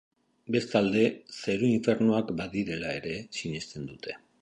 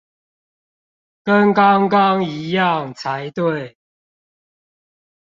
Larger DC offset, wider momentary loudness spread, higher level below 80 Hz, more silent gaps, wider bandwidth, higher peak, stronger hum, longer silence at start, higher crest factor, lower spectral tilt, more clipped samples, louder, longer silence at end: neither; about the same, 14 LU vs 13 LU; about the same, -60 dBFS vs -64 dBFS; neither; first, 10 kHz vs 7.4 kHz; second, -10 dBFS vs -2 dBFS; neither; second, 0.5 s vs 1.25 s; about the same, 18 dB vs 18 dB; about the same, -6 dB/octave vs -7 dB/octave; neither; second, -29 LUFS vs -17 LUFS; second, 0.25 s vs 1.55 s